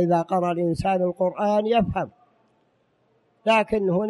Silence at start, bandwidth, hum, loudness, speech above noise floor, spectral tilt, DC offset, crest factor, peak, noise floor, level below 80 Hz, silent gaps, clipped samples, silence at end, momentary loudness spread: 0 s; 11.5 kHz; none; -23 LUFS; 44 dB; -7 dB/octave; under 0.1%; 14 dB; -10 dBFS; -66 dBFS; -50 dBFS; none; under 0.1%; 0 s; 7 LU